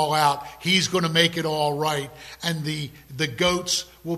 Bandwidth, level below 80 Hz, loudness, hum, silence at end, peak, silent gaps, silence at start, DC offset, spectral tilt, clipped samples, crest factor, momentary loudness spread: 14.5 kHz; -54 dBFS; -23 LUFS; none; 0 s; -4 dBFS; none; 0 s; under 0.1%; -3.5 dB/octave; under 0.1%; 20 dB; 10 LU